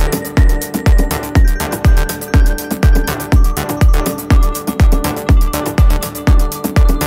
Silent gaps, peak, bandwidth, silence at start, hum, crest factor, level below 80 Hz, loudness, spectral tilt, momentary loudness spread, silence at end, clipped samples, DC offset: none; 0 dBFS; 16.5 kHz; 0 s; none; 10 dB; -12 dBFS; -14 LUFS; -5.5 dB/octave; 3 LU; 0 s; under 0.1%; under 0.1%